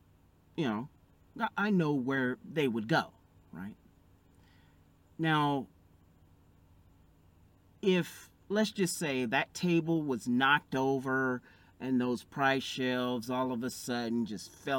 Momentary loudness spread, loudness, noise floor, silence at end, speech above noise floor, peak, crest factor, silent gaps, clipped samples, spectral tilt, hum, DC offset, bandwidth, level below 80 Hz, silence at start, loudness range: 14 LU; -32 LUFS; -64 dBFS; 0 s; 32 dB; -14 dBFS; 20 dB; none; under 0.1%; -5 dB/octave; none; under 0.1%; 17 kHz; -70 dBFS; 0.55 s; 7 LU